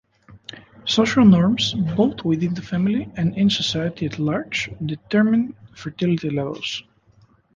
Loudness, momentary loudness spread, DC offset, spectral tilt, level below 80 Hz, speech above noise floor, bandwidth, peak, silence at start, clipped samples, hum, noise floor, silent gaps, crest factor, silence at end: -20 LUFS; 16 LU; under 0.1%; -6 dB/octave; -52 dBFS; 36 dB; 7.6 kHz; -2 dBFS; 0.3 s; under 0.1%; none; -56 dBFS; none; 18 dB; 0.75 s